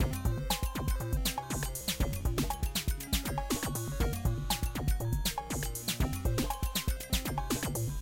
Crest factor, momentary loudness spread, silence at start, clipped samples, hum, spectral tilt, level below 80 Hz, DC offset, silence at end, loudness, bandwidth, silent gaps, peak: 16 dB; 2 LU; 0 s; under 0.1%; none; -4 dB/octave; -36 dBFS; under 0.1%; 0 s; -34 LUFS; 17 kHz; none; -16 dBFS